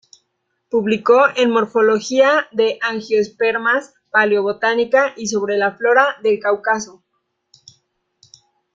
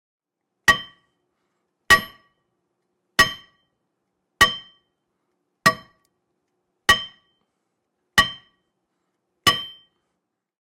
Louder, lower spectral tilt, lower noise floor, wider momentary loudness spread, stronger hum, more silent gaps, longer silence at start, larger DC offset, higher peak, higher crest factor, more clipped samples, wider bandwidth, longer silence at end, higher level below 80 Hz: first, -16 LUFS vs -19 LUFS; first, -3.5 dB/octave vs -1.5 dB/octave; second, -71 dBFS vs -79 dBFS; second, 7 LU vs 19 LU; neither; neither; about the same, 0.75 s vs 0.65 s; neither; about the same, -2 dBFS vs -4 dBFS; second, 16 dB vs 22 dB; neither; second, 7.6 kHz vs 16 kHz; first, 1.85 s vs 1.05 s; second, -66 dBFS vs -50 dBFS